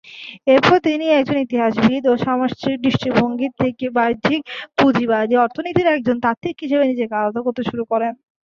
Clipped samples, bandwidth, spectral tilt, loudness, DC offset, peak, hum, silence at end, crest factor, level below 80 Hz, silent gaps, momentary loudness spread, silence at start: under 0.1%; 7.2 kHz; -6.5 dB/octave; -18 LUFS; under 0.1%; -2 dBFS; none; 0.4 s; 16 dB; -52 dBFS; 6.37-6.41 s; 7 LU; 0.05 s